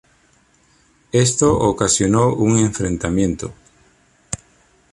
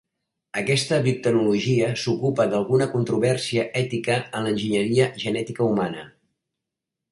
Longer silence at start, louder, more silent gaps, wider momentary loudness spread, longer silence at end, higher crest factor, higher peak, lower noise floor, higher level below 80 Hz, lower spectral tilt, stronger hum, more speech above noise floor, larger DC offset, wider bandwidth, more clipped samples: first, 1.15 s vs 0.55 s; first, -17 LUFS vs -23 LUFS; neither; first, 16 LU vs 6 LU; second, 0.55 s vs 1 s; about the same, 16 dB vs 18 dB; about the same, -2 dBFS vs -4 dBFS; second, -57 dBFS vs -85 dBFS; first, -40 dBFS vs -60 dBFS; about the same, -5 dB/octave vs -5.5 dB/octave; neither; second, 40 dB vs 63 dB; neither; about the same, 11.5 kHz vs 11.5 kHz; neither